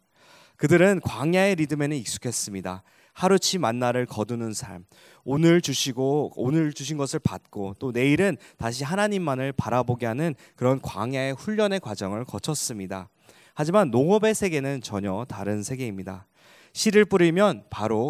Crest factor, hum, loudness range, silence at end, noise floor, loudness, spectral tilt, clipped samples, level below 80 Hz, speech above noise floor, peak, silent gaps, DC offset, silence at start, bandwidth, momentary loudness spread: 18 dB; none; 3 LU; 0 s; -55 dBFS; -24 LUFS; -5 dB/octave; under 0.1%; -54 dBFS; 31 dB; -6 dBFS; none; under 0.1%; 0.6 s; 16 kHz; 13 LU